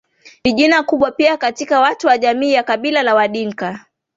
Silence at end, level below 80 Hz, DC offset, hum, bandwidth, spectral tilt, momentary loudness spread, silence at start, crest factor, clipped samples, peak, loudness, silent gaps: 0.4 s; -54 dBFS; under 0.1%; none; 8 kHz; -4 dB/octave; 9 LU; 0.25 s; 16 dB; under 0.1%; 0 dBFS; -15 LUFS; none